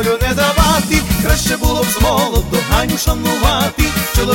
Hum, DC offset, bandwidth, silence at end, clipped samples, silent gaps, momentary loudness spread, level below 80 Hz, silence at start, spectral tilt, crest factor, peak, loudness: none; under 0.1%; 17 kHz; 0 s; under 0.1%; none; 3 LU; -20 dBFS; 0 s; -4 dB/octave; 14 dB; 0 dBFS; -14 LUFS